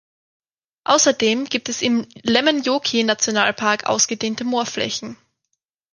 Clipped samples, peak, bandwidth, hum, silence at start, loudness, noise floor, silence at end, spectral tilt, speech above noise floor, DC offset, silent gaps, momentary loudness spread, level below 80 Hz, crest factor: under 0.1%; -2 dBFS; 11 kHz; none; 0.9 s; -19 LUFS; -76 dBFS; 0.8 s; -2 dB/octave; 57 dB; under 0.1%; none; 8 LU; -64 dBFS; 18 dB